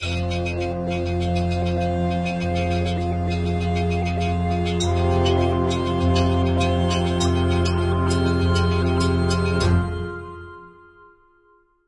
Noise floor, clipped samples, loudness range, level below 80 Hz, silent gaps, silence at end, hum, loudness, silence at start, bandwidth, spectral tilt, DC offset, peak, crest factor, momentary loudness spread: -59 dBFS; under 0.1%; 3 LU; -38 dBFS; none; 1.15 s; none; -22 LUFS; 0 s; 11 kHz; -6.5 dB/octave; under 0.1%; -8 dBFS; 14 dB; 5 LU